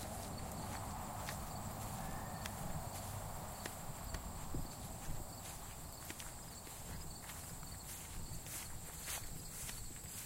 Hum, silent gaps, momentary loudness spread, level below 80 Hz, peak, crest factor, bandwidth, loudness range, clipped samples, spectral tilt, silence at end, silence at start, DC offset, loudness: none; none; 4 LU; -52 dBFS; -24 dBFS; 22 dB; 16 kHz; 3 LU; under 0.1%; -3.5 dB/octave; 0 s; 0 s; under 0.1%; -47 LUFS